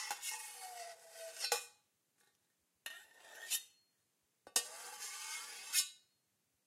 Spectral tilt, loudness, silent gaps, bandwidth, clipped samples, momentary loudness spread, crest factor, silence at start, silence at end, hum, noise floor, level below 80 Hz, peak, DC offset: 3.5 dB/octave; -41 LUFS; none; 16 kHz; under 0.1%; 17 LU; 30 dB; 0 s; 0.7 s; none; -82 dBFS; under -90 dBFS; -16 dBFS; under 0.1%